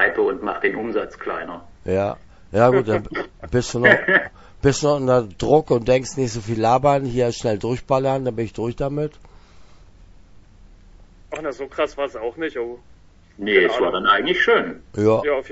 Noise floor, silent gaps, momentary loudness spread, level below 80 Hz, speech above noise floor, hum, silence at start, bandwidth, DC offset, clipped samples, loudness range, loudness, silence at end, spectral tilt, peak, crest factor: -46 dBFS; none; 13 LU; -44 dBFS; 27 dB; none; 0 s; 8 kHz; under 0.1%; under 0.1%; 12 LU; -20 LUFS; 0 s; -5.5 dB/octave; 0 dBFS; 20 dB